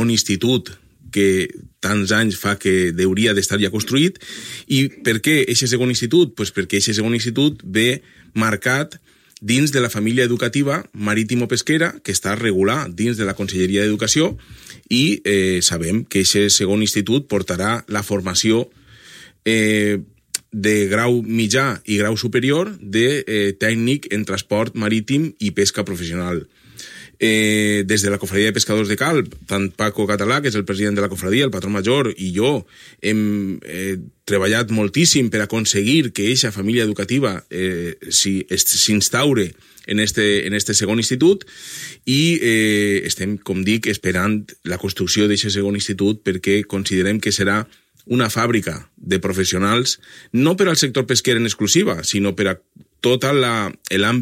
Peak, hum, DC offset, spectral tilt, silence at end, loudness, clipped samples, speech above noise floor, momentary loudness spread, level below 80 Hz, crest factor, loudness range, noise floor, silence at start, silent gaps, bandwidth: -2 dBFS; none; under 0.1%; -4 dB/octave; 0 s; -18 LUFS; under 0.1%; 25 dB; 8 LU; -52 dBFS; 18 dB; 3 LU; -44 dBFS; 0 s; none; 16.5 kHz